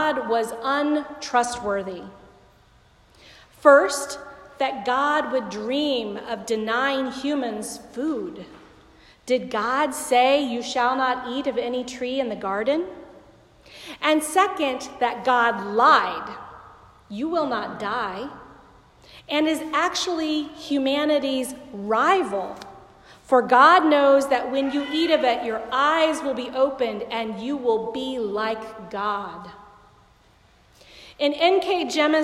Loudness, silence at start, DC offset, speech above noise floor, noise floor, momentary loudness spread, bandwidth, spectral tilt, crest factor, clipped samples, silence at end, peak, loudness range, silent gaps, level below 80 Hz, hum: -22 LUFS; 0 s; under 0.1%; 34 dB; -56 dBFS; 15 LU; 14.5 kHz; -3 dB/octave; 22 dB; under 0.1%; 0 s; -2 dBFS; 8 LU; none; -60 dBFS; none